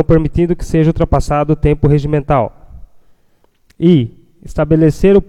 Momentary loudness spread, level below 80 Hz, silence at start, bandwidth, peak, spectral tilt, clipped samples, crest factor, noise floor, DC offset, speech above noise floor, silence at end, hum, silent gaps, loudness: 6 LU; -24 dBFS; 0 s; 11.5 kHz; 0 dBFS; -8.5 dB/octave; under 0.1%; 12 dB; -53 dBFS; under 0.1%; 42 dB; 0.05 s; none; none; -13 LUFS